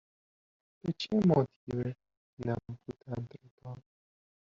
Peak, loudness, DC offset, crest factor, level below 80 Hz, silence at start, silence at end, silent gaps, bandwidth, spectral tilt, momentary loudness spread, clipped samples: -16 dBFS; -33 LUFS; under 0.1%; 20 dB; -64 dBFS; 0.85 s; 0.7 s; 1.56-1.67 s, 2.17-2.37 s, 3.51-3.58 s; 7.4 kHz; -7 dB/octave; 21 LU; under 0.1%